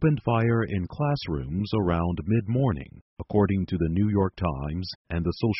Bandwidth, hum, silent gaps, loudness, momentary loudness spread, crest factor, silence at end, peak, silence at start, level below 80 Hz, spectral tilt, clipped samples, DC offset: 6 kHz; none; 3.01-3.16 s, 4.95-5.05 s; -26 LUFS; 8 LU; 16 dB; 0 s; -10 dBFS; 0 s; -42 dBFS; -7 dB/octave; under 0.1%; under 0.1%